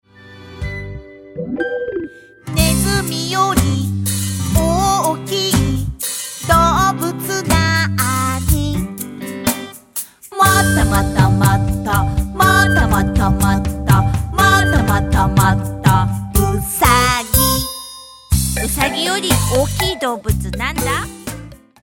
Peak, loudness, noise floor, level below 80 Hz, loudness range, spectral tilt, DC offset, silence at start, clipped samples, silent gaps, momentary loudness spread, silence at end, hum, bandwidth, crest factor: 0 dBFS; -16 LUFS; -39 dBFS; -26 dBFS; 4 LU; -4.5 dB/octave; under 0.1%; 0.25 s; under 0.1%; none; 14 LU; 0.3 s; none; 17.5 kHz; 16 dB